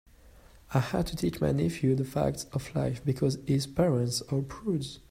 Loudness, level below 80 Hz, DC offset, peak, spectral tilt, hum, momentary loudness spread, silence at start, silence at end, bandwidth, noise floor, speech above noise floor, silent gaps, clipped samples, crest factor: -30 LUFS; -50 dBFS; under 0.1%; -10 dBFS; -6.5 dB/octave; none; 6 LU; 0.25 s; 0.1 s; 16 kHz; -55 dBFS; 26 dB; none; under 0.1%; 18 dB